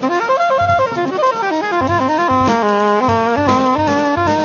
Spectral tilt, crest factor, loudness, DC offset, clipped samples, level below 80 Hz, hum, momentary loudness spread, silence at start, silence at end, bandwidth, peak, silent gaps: -6 dB/octave; 14 dB; -14 LUFS; under 0.1%; under 0.1%; -46 dBFS; none; 2 LU; 0 s; 0 s; 7.2 kHz; 0 dBFS; none